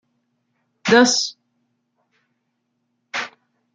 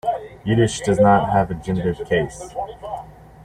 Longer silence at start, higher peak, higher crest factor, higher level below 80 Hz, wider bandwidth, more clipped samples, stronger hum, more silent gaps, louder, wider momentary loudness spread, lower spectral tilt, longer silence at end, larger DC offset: first, 0.85 s vs 0.05 s; about the same, -2 dBFS vs -4 dBFS; first, 22 dB vs 16 dB; second, -68 dBFS vs -44 dBFS; second, 9.4 kHz vs 13 kHz; neither; neither; neither; about the same, -18 LUFS vs -20 LUFS; about the same, 16 LU vs 16 LU; second, -2.5 dB/octave vs -6 dB/octave; first, 0.5 s vs 0 s; neither